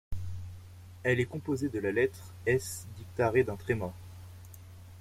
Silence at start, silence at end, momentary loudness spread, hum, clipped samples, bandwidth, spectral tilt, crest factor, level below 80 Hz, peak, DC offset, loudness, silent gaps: 0.1 s; 0 s; 21 LU; none; under 0.1%; 16 kHz; -6 dB/octave; 20 dB; -52 dBFS; -14 dBFS; under 0.1%; -32 LUFS; none